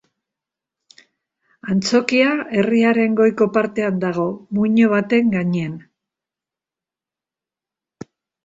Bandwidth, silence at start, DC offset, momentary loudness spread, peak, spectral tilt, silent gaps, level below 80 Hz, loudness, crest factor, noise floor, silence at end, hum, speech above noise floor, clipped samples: 8 kHz; 1.65 s; under 0.1%; 8 LU; -2 dBFS; -6 dB/octave; none; -62 dBFS; -18 LUFS; 18 dB; -89 dBFS; 2.65 s; none; 72 dB; under 0.1%